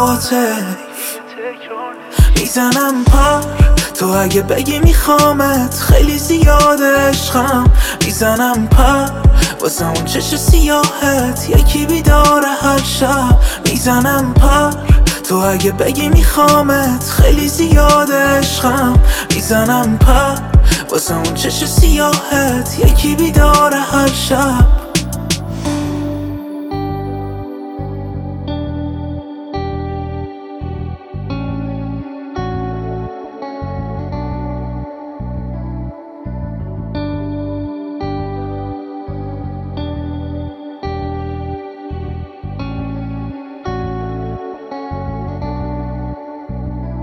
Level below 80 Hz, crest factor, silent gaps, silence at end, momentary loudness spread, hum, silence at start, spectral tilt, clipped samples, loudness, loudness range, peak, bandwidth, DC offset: -18 dBFS; 14 dB; none; 0 s; 16 LU; none; 0 s; -5 dB/octave; under 0.1%; -14 LUFS; 13 LU; 0 dBFS; 17 kHz; under 0.1%